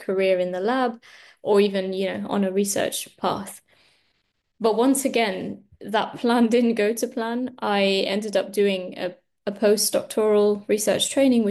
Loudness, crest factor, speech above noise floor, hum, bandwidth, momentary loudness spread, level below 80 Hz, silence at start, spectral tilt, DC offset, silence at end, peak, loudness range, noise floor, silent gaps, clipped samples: -22 LUFS; 14 dB; 50 dB; none; 12.5 kHz; 12 LU; -70 dBFS; 0 s; -4 dB/octave; under 0.1%; 0 s; -8 dBFS; 3 LU; -72 dBFS; none; under 0.1%